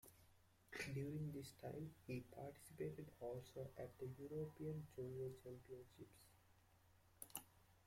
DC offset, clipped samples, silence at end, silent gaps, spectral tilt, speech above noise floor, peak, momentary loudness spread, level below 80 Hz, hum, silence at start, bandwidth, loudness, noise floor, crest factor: under 0.1%; under 0.1%; 0 s; none; -6 dB/octave; 22 dB; -30 dBFS; 11 LU; -76 dBFS; none; 0.05 s; 16.5 kHz; -53 LUFS; -74 dBFS; 24 dB